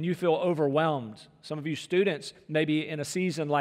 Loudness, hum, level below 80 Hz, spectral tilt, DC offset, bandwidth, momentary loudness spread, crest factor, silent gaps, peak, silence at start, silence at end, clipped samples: -28 LUFS; none; -76 dBFS; -6 dB/octave; under 0.1%; 15 kHz; 11 LU; 16 dB; none; -12 dBFS; 0 s; 0 s; under 0.1%